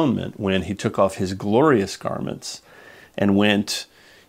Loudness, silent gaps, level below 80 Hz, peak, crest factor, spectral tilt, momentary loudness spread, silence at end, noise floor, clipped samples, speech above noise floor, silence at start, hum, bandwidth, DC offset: -21 LUFS; none; -54 dBFS; -2 dBFS; 20 dB; -5.5 dB/octave; 16 LU; 0.45 s; -47 dBFS; under 0.1%; 26 dB; 0 s; none; 16 kHz; under 0.1%